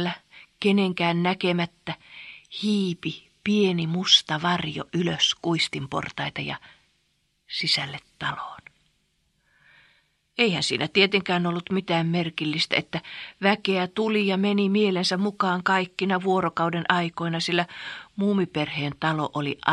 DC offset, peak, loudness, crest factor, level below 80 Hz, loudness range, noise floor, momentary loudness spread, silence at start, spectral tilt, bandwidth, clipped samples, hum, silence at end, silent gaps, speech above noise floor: under 0.1%; 0 dBFS; -24 LUFS; 26 dB; -64 dBFS; 7 LU; -70 dBFS; 12 LU; 0 s; -4.5 dB/octave; 11.5 kHz; under 0.1%; none; 0 s; none; 46 dB